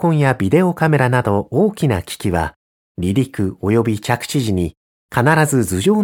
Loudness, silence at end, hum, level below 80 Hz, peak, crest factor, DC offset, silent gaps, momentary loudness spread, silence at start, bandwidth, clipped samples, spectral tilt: -17 LUFS; 0 s; none; -42 dBFS; 0 dBFS; 16 dB; under 0.1%; 2.56-2.95 s, 4.77-5.09 s; 7 LU; 0 s; 17.5 kHz; under 0.1%; -6 dB/octave